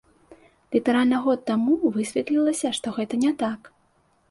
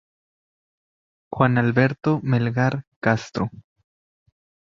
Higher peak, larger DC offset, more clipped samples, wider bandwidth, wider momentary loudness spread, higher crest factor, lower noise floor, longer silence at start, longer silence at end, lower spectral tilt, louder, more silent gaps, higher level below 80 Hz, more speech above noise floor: second, -8 dBFS vs -2 dBFS; neither; neither; first, 11.5 kHz vs 7.4 kHz; second, 7 LU vs 10 LU; second, 16 dB vs 22 dB; second, -64 dBFS vs under -90 dBFS; second, 0.3 s vs 1.3 s; second, 0.65 s vs 1.1 s; second, -4.5 dB/octave vs -8 dB/octave; about the same, -23 LUFS vs -22 LUFS; second, none vs 2.87-3.02 s; second, -64 dBFS vs -56 dBFS; second, 42 dB vs over 69 dB